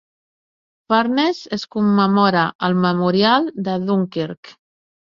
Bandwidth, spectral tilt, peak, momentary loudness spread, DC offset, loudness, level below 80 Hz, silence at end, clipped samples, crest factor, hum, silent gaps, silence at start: 7.2 kHz; -7 dB/octave; -2 dBFS; 11 LU; under 0.1%; -18 LUFS; -60 dBFS; 0.55 s; under 0.1%; 18 dB; none; 2.55-2.59 s, 4.37-4.43 s; 0.9 s